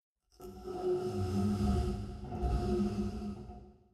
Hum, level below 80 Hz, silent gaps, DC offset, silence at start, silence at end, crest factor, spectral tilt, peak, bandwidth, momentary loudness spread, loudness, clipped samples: none; -42 dBFS; none; under 0.1%; 0.4 s; 0.2 s; 16 dB; -8 dB/octave; -20 dBFS; 13 kHz; 17 LU; -35 LUFS; under 0.1%